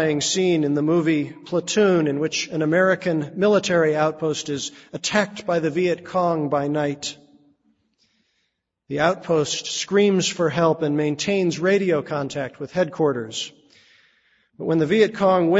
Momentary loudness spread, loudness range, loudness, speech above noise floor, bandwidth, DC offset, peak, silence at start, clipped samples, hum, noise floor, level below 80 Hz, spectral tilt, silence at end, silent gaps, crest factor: 9 LU; 5 LU; -21 LUFS; 53 dB; 8 kHz; under 0.1%; -4 dBFS; 0 s; under 0.1%; none; -74 dBFS; -62 dBFS; -4.5 dB/octave; 0 s; none; 18 dB